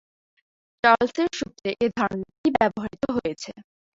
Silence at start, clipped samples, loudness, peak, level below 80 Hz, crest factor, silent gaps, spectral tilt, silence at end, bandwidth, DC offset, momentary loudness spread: 0.85 s; under 0.1%; -24 LUFS; -2 dBFS; -56 dBFS; 22 dB; 2.38-2.44 s; -5 dB/octave; 0.35 s; 7.8 kHz; under 0.1%; 11 LU